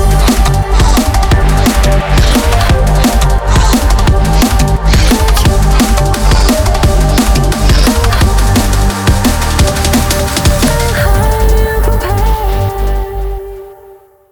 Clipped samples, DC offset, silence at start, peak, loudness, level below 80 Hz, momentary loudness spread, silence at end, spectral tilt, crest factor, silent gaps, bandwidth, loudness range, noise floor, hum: under 0.1%; under 0.1%; 0 s; 0 dBFS; -10 LUFS; -10 dBFS; 4 LU; 0.6 s; -5 dB/octave; 8 dB; none; over 20 kHz; 2 LU; -38 dBFS; none